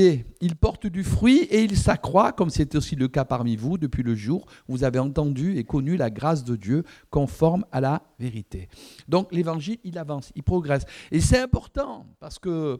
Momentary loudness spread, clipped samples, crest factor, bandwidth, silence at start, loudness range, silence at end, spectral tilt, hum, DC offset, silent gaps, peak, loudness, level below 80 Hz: 13 LU; under 0.1%; 18 dB; 15 kHz; 0 s; 5 LU; 0 s; -6.5 dB/octave; none; under 0.1%; none; -4 dBFS; -24 LUFS; -38 dBFS